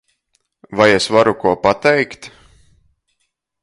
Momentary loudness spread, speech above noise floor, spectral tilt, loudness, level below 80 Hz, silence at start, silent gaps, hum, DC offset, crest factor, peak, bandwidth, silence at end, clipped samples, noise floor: 13 LU; 56 dB; -4.5 dB/octave; -14 LUFS; -50 dBFS; 0.7 s; none; none; under 0.1%; 18 dB; 0 dBFS; 11.5 kHz; 1.35 s; under 0.1%; -70 dBFS